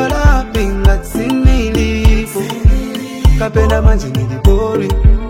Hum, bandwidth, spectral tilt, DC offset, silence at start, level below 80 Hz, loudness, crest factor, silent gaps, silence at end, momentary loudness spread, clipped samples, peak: none; 16 kHz; -6.5 dB/octave; under 0.1%; 0 s; -12 dBFS; -14 LUFS; 10 dB; none; 0 s; 5 LU; under 0.1%; 0 dBFS